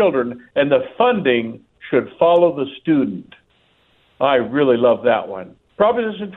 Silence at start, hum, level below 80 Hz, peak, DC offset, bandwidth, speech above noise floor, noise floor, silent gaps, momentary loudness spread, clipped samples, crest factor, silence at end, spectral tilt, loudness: 0 s; none; -60 dBFS; -2 dBFS; under 0.1%; 4.1 kHz; 42 dB; -59 dBFS; none; 15 LU; under 0.1%; 16 dB; 0 s; -9 dB/octave; -17 LUFS